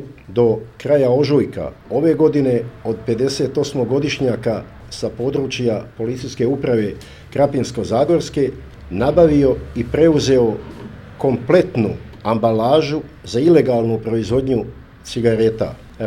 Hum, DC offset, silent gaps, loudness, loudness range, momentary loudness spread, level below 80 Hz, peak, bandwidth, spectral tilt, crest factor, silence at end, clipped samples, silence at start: none; under 0.1%; none; -18 LUFS; 4 LU; 12 LU; -40 dBFS; 0 dBFS; 13 kHz; -7 dB/octave; 18 dB; 0 s; under 0.1%; 0 s